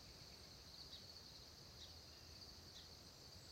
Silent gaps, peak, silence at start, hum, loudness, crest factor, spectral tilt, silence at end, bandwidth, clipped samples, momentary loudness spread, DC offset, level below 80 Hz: none; -44 dBFS; 0 s; none; -58 LUFS; 16 dB; -2.5 dB/octave; 0 s; 16 kHz; under 0.1%; 3 LU; under 0.1%; -72 dBFS